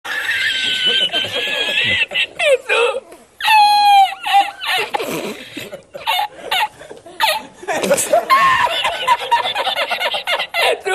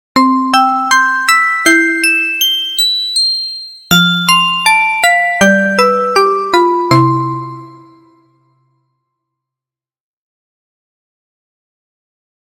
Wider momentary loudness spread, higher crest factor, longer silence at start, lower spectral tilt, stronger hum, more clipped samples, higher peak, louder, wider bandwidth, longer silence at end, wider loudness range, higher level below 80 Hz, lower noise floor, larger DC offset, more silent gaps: first, 12 LU vs 4 LU; about the same, 14 dB vs 14 dB; about the same, 0.05 s vs 0.15 s; second, -1 dB/octave vs -3 dB/octave; neither; neither; about the same, -2 dBFS vs 0 dBFS; second, -15 LUFS vs -10 LUFS; second, 14 kHz vs 17 kHz; second, 0 s vs 4.8 s; about the same, 6 LU vs 7 LU; about the same, -56 dBFS vs -54 dBFS; second, -37 dBFS vs -89 dBFS; neither; neither